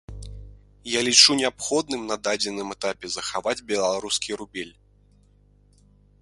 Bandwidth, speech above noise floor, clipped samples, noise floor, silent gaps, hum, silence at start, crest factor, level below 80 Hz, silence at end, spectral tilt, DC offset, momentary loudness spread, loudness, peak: 11.5 kHz; 33 dB; under 0.1%; -57 dBFS; none; 50 Hz at -55 dBFS; 0.1 s; 26 dB; -50 dBFS; 1.55 s; -1.5 dB/octave; under 0.1%; 23 LU; -22 LUFS; 0 dBFS